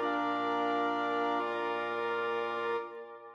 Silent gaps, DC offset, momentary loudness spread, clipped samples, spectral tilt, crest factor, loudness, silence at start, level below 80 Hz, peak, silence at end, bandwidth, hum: none; under 0.1%; 5 LU; under 0.1%; -5 dB/octave; 14 dB; -33 LUFS; 0 s; -86 dBFS; -20 dBFS; 0 s; 8 kHz; none